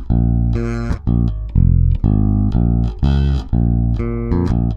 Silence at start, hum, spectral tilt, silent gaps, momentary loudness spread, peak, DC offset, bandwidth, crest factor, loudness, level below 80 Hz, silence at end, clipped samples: 0 s; none; -10 dB/octave; none; 4 LU; -2 dBFS; under 0.1%; 6.6 kHz; 14 dB; -17 LUFS; -18 dBFS; 0 s; under 0.1%